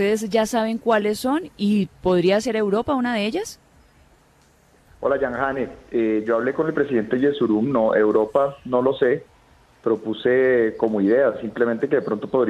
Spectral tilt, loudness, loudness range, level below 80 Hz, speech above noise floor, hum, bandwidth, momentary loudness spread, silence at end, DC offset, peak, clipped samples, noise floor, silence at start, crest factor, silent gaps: -6 dB/octave; -21 LUFS; 5 LU; -54 dBFS; 36 dB; none; 14 kHz; 6 LU; 0 s; under 0.1%; -4 dBFS; under 0.1%; -56 dBFS; 0 s; 16 dB; none